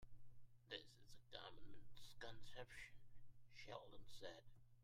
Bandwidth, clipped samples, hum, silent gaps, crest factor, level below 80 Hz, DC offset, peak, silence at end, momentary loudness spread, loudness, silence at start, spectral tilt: 16 kHz; under 0.1%; none; none; 18 dB; -70 dBFS; under 0.1%; -36 dBFS; 0 s; 11 LU; -60 LUFS; 0 s; -3.5 dB/octave